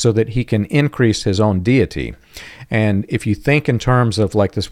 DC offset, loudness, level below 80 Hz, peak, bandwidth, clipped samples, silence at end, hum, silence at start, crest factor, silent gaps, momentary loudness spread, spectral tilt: under 0.1%; -17 LUFS; -38 dBFS; -2 dBFS; 14 kHz; under 0.1%; 0 s; none; 0 s; 14 dB; none; 10 LU; -6.5 dB/octave